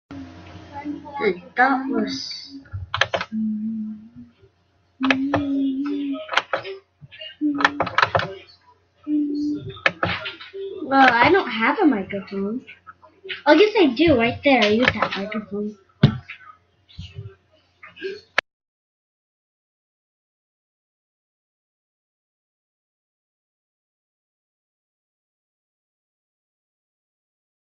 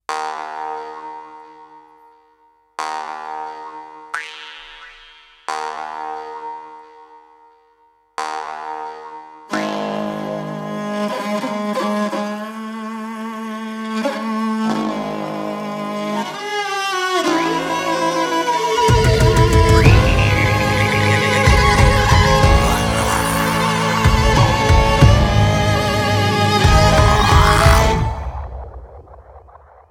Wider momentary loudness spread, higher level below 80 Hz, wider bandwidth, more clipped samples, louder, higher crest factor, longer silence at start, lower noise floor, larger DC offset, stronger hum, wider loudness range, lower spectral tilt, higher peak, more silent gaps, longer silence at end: first, 22 LU vs 18 LU; second, -56 dBFS vs -24 dBFS; second, 7.2 kHz vs 17.5 kHz; neither; second, -21 LUFS vs -16 LUFS; first, 24 dB vs 16 dB; about the same, 0.1 s vs 0.1 s; first, -63 dBFS vs -56 dBFS; neither; neither; second, 14 LU vs 17 LU; about the same, -6 dB/octave vs -5 dB/octave; about the same, 0 dBFS vs 0 dBFS; neither; first, 9.3 s vs 0.5 s